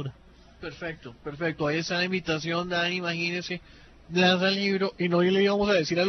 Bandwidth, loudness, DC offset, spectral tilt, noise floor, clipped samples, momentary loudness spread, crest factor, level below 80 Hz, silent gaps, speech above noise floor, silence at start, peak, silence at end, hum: 6.4 kHz; -26 LUFS; under 0.1%; -5 dB/octave; -53 dBFS; under 0.1%; 15 LU; 16 dB; -56 dBFS; none; 27 dB; 0 s; -10 dBFS; 0 s; none